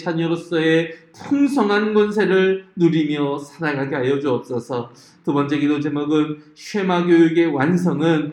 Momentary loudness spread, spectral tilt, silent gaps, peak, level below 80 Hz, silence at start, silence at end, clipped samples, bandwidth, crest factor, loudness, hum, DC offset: 10 LU; -7 dB/octave; none; -4 dBFS; -66 dBFS; 0 s; 0 s; under 0.1%; 11.5 kHz; 14 dB; -19 LUFS; none; under 0.1%